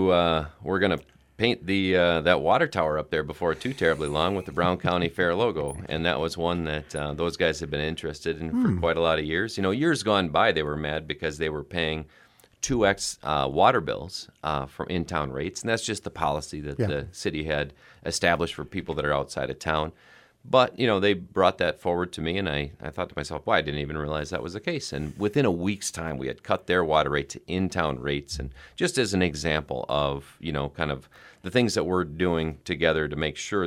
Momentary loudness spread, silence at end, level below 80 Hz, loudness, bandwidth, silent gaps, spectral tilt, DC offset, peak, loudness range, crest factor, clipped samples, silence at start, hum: 9 LU; 0 s; -46 dBFS; -26 LUFS; 15.5 kHz; none; -5 dB/octave; under 0.1%; -4 dBFS; 4 LU; 22 dB; under 0.1%; 0 s; none